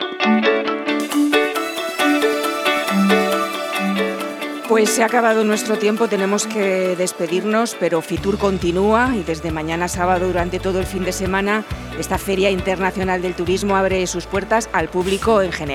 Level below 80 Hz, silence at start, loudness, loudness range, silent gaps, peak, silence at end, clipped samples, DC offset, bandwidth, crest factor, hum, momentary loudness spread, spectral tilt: -38 dBFS; 0 s; -18 LUFS; 2 LU; none; -2 dBFS; 0 s; under 0.1%; under 0.1%; 18 kHz; 16 dB; none; 7 LU; -4.5 dB/octave